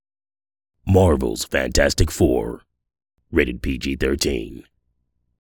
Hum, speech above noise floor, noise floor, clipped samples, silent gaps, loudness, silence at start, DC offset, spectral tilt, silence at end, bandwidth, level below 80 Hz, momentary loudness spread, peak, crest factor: none; 52 dB; -71 dBFS; under 0.1%; none; -20 LUFS; 0.85 s; under 0.1%; -5 dB/octave; 1 s; 18 kHz; -32 dBFS; 13 LU; -2 dBFS; 20 dB